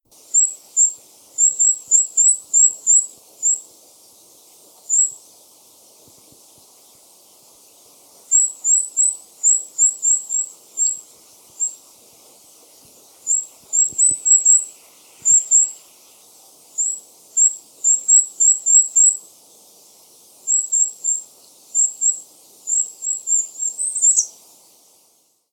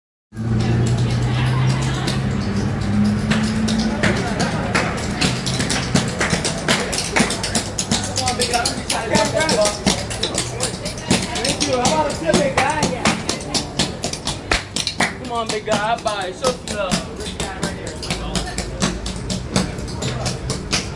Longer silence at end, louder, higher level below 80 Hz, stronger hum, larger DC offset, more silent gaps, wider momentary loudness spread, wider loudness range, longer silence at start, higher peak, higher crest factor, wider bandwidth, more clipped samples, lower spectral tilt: first, 1.2 s vs 0 s; first, -15 LUFS vs -20 LUFS; second, -74 dBFS vs -34 dBFS; neither; neither; neither; first, 12 LU vs 7 LU; first, 9 LU vs 5 LU; about the same, 0.35 s vs 0.35 s; about the same, -2 dBFS vs -2 dBFS; about the same, 18 dB vs 20 dB; first, 19 kHz vs 11.5 kHz; neither; second, 2.5 dB/octave vs -4 dB/octave